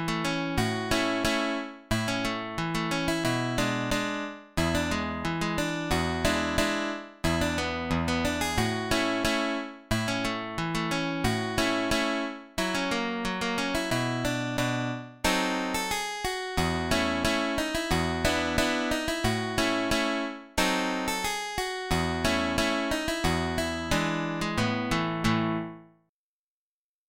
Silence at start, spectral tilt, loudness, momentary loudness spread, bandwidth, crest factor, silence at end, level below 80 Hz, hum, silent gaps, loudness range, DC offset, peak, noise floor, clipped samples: 0 s; -4 dB/octave; -28 LUFS; 5 LU; 17 kHz; 18 dB; 1.25 s; -44 dBFS; none; none; 2 LU; 0.1%; -10 dBFS; under -90 dBFS; under 0.1%